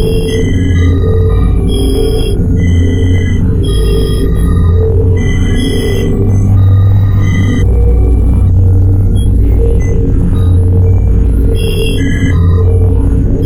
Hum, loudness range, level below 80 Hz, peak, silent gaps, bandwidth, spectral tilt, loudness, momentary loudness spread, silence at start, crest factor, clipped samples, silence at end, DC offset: none; 2 LU; -12 dBFS; 0 dBFS; none; 13.5 kHz; -7.5 dB/octave; -10 LUFS; 4 LU; 0 s; 8 dB; under 0.1%; 0 s; under 0.1%